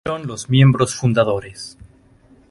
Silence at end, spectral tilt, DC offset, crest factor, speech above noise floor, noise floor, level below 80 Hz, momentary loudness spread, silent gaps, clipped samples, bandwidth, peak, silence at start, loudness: 0.8 s; -6 dB/octave; under 0.1%; 16 dB; 34 dB; -51 dBFS; -46 dBFS; 20 LU; none; under 0.1%; 11.5 kHz; -2 dBFS; 0.05 s; -17 LUFS